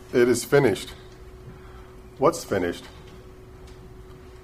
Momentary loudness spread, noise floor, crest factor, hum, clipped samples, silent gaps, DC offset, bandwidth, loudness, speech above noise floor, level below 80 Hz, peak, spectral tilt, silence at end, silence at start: 25 LU; -44 dBFS; 20 dB; none; under 0.1%; none; under 0.1%; 15.5 kHz; -23 LUFS; 22 dB; -48 dBFS; -6 dBFS; -5 dB/octave; 0.1 s; 0.1 s